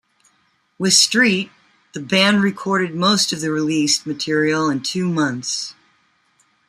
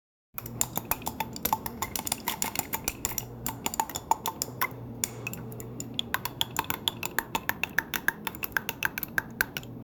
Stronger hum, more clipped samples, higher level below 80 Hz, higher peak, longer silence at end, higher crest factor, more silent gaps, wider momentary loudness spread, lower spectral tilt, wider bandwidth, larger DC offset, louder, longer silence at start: neither; neither; second, -64 dBFS vs -54 dBFS; first, -2 dBFS vs -6 dBFS; first, 0.95 s vs 0.15 s; second, 18 dB vs 28 dB; neither; first, 11 LU vs 6 LU; about the same, -3 dB/octave vs -2 dB/octave; second, 14.5 kHz vs over 20 kHz; neither; first, -17 LUFS vs -31 LUFS; first, 0.8 s vs 0.35 s